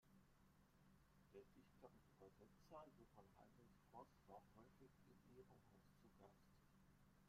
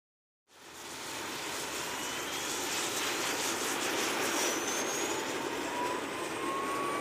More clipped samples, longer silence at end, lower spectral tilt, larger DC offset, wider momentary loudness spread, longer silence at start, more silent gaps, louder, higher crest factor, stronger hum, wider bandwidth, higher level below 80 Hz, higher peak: neither; about the same, 0 s vs 0 s; first, -6 dB/octave vs -1 dB/octave; neither; about the same, 5 LU vs 7 LU; second, 0 s vs 0.55 s; neither; second, -67 LUFS vs -33 LUFS; first, 22 dB vs 16 dB; neither; about the same, 14.5 kHz vs 15.5 kHz; second, -82 dBFS vs -68 dBFS; second, -48 dBFS vs -20 dBFS